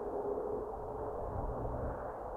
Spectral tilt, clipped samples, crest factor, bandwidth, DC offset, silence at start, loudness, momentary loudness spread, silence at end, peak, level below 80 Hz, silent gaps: -10 dB/octave; under 0.1%; 14 dB; 13 kHz; under 0.1%; 0 s; -40 LUFS; 4 LU; 0 s; -26 dBFS; -48 dBFS; none